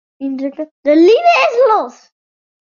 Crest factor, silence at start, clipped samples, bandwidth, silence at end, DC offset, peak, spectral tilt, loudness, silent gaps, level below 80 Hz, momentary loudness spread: 12 dB; 0.2 s; under 0.1%; 7.2 kHz; 0.8 s; under 0.1%; -2 dBFS; -3 dB/octave; -12 LUFS; 0.71-0.83 s; -66 dBFS; 15 LU